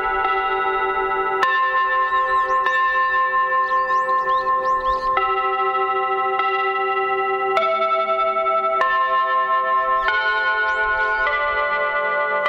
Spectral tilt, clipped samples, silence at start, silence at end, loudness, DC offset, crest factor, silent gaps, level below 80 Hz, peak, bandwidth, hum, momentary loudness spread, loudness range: -3.5 dB/octave; under 0.1%; 0 s; 0 s; -19 LUFS; under 0.1%; 14 dB; none; -48 dBFS; -6 dBFS; 8 kHz; none; 2 LU; 1 LU